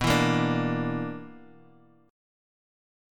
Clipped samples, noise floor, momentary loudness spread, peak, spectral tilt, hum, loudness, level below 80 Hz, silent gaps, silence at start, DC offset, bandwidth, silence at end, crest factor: under 0.1%; -57 dBFS; 18 LU; -10 dBFS; -5.5 dB/octave; none; -27 LUFS; -50 dBFS; none; 0 s; under 0.1%; 17.5 kHz; 1.7 s; 20 dB